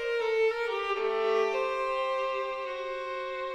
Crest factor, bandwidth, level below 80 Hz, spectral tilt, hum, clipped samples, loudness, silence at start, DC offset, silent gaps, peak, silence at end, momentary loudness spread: 14 dB; 9.4 kHz; -62 dBFS; -2 dB/octave; none; under 0.1%; -30 LUFS; 0 s; under 0.1%; none; -16 dBFS; 0 s; 7 LU